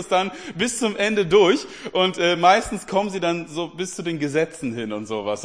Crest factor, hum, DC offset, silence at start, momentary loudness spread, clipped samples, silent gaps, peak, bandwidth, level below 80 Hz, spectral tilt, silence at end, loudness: 18 dB; none; 0.2%; 0 s; 12 LU; under 0.1%; none; -2 dBFS; 10.5 kHz; -54 dBFS; -4 dB/octave; 0 s; -21 LUFS